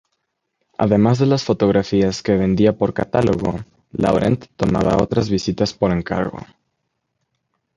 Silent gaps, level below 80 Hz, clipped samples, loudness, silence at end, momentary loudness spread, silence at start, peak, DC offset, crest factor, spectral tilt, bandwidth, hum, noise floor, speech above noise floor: none; -42 dBFS; under 0.1%; -18 LUFS; 1.3 s; 8 LU; 0.8 s; 0 dBFS; under 0.1%; 18 dB; -7 dB/octave; 10.5 kHz; none; -74 dBFS; 56 dB